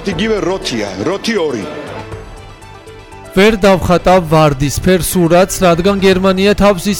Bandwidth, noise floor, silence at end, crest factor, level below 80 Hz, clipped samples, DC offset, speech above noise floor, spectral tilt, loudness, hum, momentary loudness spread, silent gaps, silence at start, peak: 18 kHz; -33 dBFS; 0 s; 10 dB; -30 dBFS; under 0.1%; under 0.1%; 22 dB; -5 dB/octave; -12 LUFS; none; 13 LU; none; 0 s; -2 dBFS